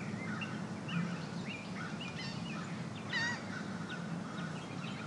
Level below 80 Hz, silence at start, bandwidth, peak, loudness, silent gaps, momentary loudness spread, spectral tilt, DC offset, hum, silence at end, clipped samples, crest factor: -72 dBFS; 0 s; 11.5 kHz; -24 dBFS; -40 LUFS; none; 6 LU; -5 dB/octave; under 0.1%; none; 0 s; under 0.1%; 18 dB